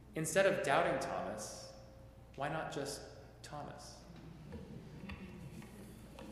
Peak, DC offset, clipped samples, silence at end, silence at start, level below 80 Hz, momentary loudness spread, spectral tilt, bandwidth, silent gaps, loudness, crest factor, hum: -16 dBFS; under 0.1%; under 0.1%; 0 s; 0 s; -62 dBFS; 22 LU; -4 dB/octave; 15 kHz; none; -38 LUFS; 24 dB; none